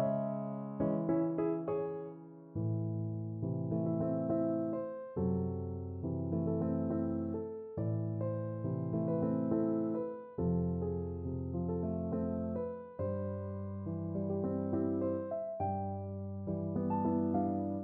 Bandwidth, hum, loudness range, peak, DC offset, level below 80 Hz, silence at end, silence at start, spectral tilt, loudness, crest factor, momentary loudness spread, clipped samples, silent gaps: 2.8 kHz; none; 2 LU; -20 dBFS; under 0.1%; -60 dBFS; 0 s; 0 s; -12.5 dB/octave; -36 LUFS; 14 dB; 8 LU; under 0.1%; none